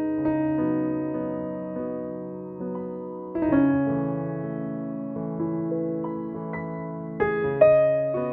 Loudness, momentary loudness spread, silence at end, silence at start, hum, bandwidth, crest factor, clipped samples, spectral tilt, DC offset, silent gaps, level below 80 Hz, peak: -26 LUFS; 13 LU; 0 s; 0 s; none; 4 kHz; 20 dB; under 0.1%; -12 dB/octave; under 0.1%; none; -56 dBFS; -4 dBFS